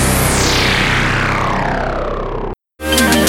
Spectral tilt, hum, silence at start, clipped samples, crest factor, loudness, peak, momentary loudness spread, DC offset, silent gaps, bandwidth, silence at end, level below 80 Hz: -3.5 dB/octave; none; 0 s; under 0.1%; 14 dB; -15 LUFS; 0 dBFS; 11 LU; under 0.1%; none; 17 kHz; 0 s; -24 dBFS